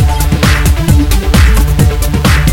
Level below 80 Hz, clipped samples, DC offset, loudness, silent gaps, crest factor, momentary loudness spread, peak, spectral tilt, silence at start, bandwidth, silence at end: -10 dBFS; 0.4%; under 0.1%; -10 LUFS; none; 8 dB; 2 LU; 0 dBFS; -5 dB/octave; 0 s; 17.5 kHz; 0 s